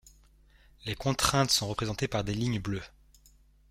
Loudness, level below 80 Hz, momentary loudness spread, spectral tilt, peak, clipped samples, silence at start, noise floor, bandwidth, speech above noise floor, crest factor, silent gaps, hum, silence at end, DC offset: -29 LUFS; -50 dBFS; 13 LU; -4 dB/octave; -8 dBFS; under 0.1%; 0.85 s; -61 dBFS; 16.5 kHz; 31 dB; 24 dB; none; none; 0.8 s; under 0.1%